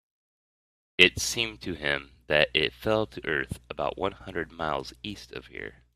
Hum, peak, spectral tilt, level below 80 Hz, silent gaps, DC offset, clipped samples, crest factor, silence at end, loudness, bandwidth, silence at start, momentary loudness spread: none; 0 dBFS; -3 dB/octave; -52 dBFS; none; under 0.1%; under 0.1%; 30 dB; 0.25 s; -27 LUFS; 15.5 kHz; 1 s; 19 LU